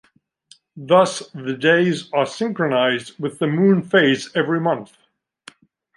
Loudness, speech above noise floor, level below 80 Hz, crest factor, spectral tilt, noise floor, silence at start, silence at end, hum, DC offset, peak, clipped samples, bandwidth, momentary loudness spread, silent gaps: -19 LUFS; 35 dB; -70 dBFS; 18 dB; -5.5 dB/octave; -54 dBFS; 0.75 s; 1.1 s; none; under 0.1%; -2 dBFS; under 0.1%; 11.5 kHz; 11 LU; none